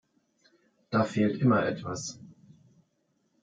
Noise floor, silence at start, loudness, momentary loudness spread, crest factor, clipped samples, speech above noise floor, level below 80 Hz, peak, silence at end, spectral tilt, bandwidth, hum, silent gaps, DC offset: -74 dBFS; 0.9 s; -28 LUFS; 14 LU; 18 dB; under 0.1%; 47 dB; -68 dBFS; -12 dBFS; 1.1 s; -6 dB/octave; 9.2 kHz; none; none; under 0.1%